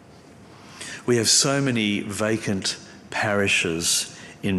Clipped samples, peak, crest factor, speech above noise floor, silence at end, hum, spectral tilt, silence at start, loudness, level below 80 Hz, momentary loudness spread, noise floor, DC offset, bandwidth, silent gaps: under 0.1%; -6 dBFS; 18 dB; 25 dB; 0 s; none; -3 dB/octave; 0.4 s; -22 LUFS; -62 dBFS; 15 LU; -47 dBFS; under 0.1%; 14 kHz; none